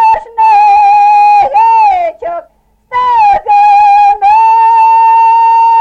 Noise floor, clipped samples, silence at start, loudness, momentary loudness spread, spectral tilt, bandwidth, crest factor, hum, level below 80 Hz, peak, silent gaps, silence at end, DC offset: -44 dBFS; under 0.1%; 0 s; -6 LUFS; 8 LU; -2.5 dB/octave; 7.4 kHz; 6 dB; none; -44 dBFS; 0 dBFS; none; 0 s; under 0.1%